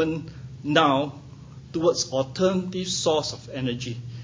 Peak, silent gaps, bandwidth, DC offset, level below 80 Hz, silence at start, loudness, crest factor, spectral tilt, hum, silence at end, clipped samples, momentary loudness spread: -2 dBFS; none; 7.8 kHz; under 0.1%; -54 dBFS; 0 s; -25 LUFS; 24 dB; -4.5 dB/octave; none; 0 s; under 0.1%; 16 LU